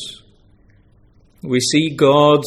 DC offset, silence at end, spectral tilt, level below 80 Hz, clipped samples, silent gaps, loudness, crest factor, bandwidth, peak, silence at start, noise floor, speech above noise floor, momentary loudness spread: under 0.1%; 0 s; -4.5 dB/octave; -54 dBFS; under 0.1%; none; -15 LUFS; 16 dB; 14 kHz; 0 dBFS; 0 s; -52 dBFS; 38 dB; 20 LU